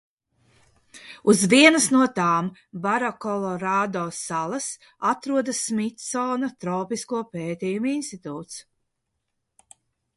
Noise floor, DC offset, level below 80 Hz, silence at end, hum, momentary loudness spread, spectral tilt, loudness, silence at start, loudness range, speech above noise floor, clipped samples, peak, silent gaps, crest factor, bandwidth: -78 dBFS; under 0.1%; -68 dBFS; 1.55 s; none; 16 LU; -3.5 dB/octave; -23 LUFS; 0.95 s; 10 LU; 55 dB; under 0.1%; 0 dBFS; none; 24 dB; 11.5 kHz